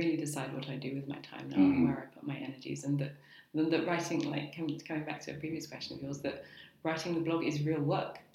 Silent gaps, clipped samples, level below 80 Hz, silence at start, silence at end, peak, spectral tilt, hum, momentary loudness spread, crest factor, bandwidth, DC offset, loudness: none; under 0.1%; -68 dBFS; 0 s; 0.15 s; -16 dBFS; -6 dB/octave; none; 11 LU; 18 dB; 15 kHz; under 0.1%; -35 LUFS